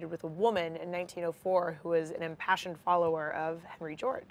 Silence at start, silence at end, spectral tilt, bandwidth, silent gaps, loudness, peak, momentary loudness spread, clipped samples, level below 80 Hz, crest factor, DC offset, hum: 0 s; 0.05 s; -5.5 dB/octave; 14.5 kHz; none; -33 LUFS; -14 dBFS; 9 LU; under 0.1%; -72 dBFS; 20 dB; under 0.1%; none